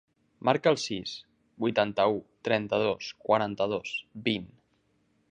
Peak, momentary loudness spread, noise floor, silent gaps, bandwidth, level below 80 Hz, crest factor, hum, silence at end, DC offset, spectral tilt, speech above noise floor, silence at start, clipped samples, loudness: -6 dBFS; 9 LU; -71 dBFS; none; 9.8 kHz; -66 dBFS; 24 dB; none; 0.85 s; under 0.1%; -5 dB/octave; 42 dB; 0.45 s; under 0.1%; -29 LUFS